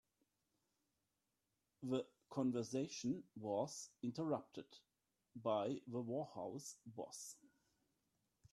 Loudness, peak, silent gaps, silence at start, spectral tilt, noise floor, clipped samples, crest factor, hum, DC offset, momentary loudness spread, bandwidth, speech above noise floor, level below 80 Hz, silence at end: -45 LUFS; -28 dBFS; none; 1.8 s; -5.5 dB/octave; -89 dBFS; under 0.1%; 20 dB; none; under 0.1%; 13 LU; 14 kHz; 44 dB; -86 dBFS; 1.05 s